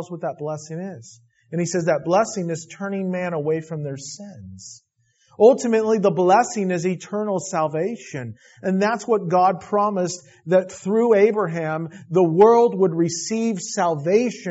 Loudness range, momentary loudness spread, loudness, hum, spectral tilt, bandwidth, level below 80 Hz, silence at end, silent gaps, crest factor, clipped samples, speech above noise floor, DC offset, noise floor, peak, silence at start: 6 LU; 17 LU; -20 LUFS; none; -6 dB/octave; 8 kHz; -68 dBFS; 0 s; none; 18 dB; under 0.1%; 40 dB; under 0.1%; -61 dBFS; -2 dBFS; 0 s